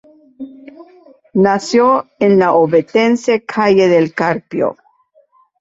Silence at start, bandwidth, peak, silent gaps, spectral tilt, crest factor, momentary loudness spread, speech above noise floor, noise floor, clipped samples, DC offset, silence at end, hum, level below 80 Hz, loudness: 0.4 s; 8 kHz; 0 dBFS; none; -6 dB/octave; 14 dB; 10 LU; 41 dB; -54 dBFS; under 0.1%; under 0.1%; 0.85 s; none; -56 dBFS; -13 LUFS